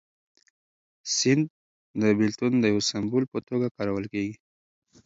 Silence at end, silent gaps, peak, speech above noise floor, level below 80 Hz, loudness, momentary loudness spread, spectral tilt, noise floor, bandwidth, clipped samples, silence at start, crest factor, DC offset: 0.7 s; 1.50-1.94 s, 3.28-3.32 s, 3.71-3.75 s; -8 dBFS; over 65 dB; -62 dBFS; -26 LUFS; 10 LU; -4.5 dB/octave; under -90 dBFS; 7.8 kHz; under 0.1%; 1.05 s; 18 dB; under 0.1%